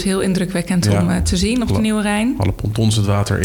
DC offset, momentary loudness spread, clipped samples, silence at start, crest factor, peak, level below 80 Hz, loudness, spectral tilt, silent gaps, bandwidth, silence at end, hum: under 0.1%; 3 LU; under 0.1%; 0 s; 16 dB; -2 dBFS; -30 dBFS; -17 LUFS; -5.5 dB/octave; none; 19 kHz; 0 s; none